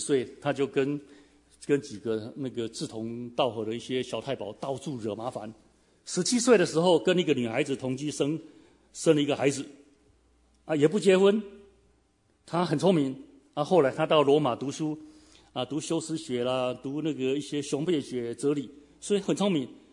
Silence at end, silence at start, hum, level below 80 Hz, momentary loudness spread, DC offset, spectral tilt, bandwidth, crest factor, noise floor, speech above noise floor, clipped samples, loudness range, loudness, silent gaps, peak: 0.2 s; 0 s; none; -68 dBFS; 14 LU; under 0.1%; -5 dB/octave; 11 kHz; 20 dB; -67 dBFS; 40 dB; under 0.1%; 6 LU; -28 LUFS; none; -8 dBFS